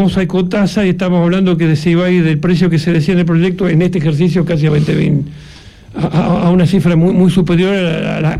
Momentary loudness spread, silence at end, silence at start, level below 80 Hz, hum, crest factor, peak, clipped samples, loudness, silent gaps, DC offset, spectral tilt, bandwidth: 4 LU; 0 s; 0 s; -36 dBFS; none; 10 dB; 0 dBFS; under 0.1%; -12 LUFS; none; under 0.1%; -8 dB/octave; 11 kHz